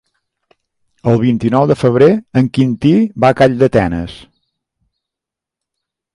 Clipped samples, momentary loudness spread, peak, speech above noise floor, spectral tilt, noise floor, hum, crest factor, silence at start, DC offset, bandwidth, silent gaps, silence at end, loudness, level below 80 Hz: under 0.1%; 8 LU; 0 dBFS; 73 dB; -8 dB/octave; -85 dBFS; none; 14 dB; 1.05 s; under 0.1%; 11 kHz; none; 1.95 s; -13 LUFS; -42 dBFS